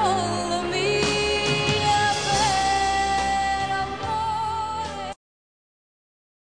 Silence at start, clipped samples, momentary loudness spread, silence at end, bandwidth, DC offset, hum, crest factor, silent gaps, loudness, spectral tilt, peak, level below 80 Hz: 0 s; under 0.1%; 8 LU; 1.25 s; 10 kHz; 0.3%; none; 16 dB; none; -23 LUFS; -3 dB/octave; -8 dBFS; -44 dBFS